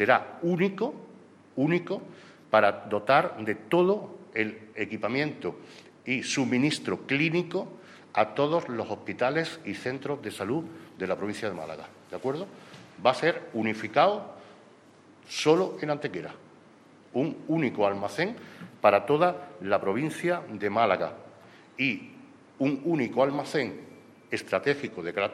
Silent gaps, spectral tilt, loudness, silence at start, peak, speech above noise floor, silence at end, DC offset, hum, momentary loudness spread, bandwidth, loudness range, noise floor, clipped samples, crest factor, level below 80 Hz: none; -5.5 dB/octave; -28 LUFS; 0 s; -6 dBFS; 28 dB; 0 s; under 0.1%; none; 15 LU; 13.5 kHz; 4 LU; -55 dBFS; under 0.1%; 24 dB; -74 dBFS